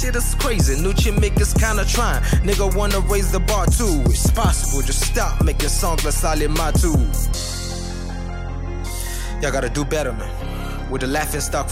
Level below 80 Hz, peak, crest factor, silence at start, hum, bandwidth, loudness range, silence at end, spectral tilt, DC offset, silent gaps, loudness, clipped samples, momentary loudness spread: -20 dBFS; -4 dBFS; 14 dB; 0 s; none; 16.5 kHz; 6 LU; 0 s; -4.5 dB/octave; under 0.1%; none; -20 LUFS; under 0.1%; 10 LU